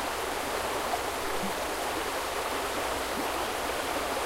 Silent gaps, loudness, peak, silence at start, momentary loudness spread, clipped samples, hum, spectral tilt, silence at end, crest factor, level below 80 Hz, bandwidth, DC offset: none; -31 LUFS; -18 dBFS; 0 s; 1 LU; under 0.1%; none; -2.5 dB/octave; 0 s; 14 dB; -50 dBFS; 16 kHz; under 0.1%